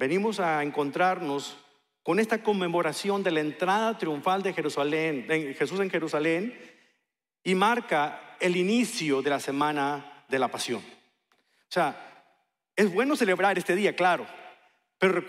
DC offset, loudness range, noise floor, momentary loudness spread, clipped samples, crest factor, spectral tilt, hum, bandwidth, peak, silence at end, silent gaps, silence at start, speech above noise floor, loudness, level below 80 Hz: under 0.1%; 3 LU; -81 dBFS; 8 LU; under 0.1%; 18 dB; -4.5 dB/octave; none; 15.5 kHz; -10 dBFS; 0 s; none; 0 s; 55 dB; -27 LUFS; -82 dBFS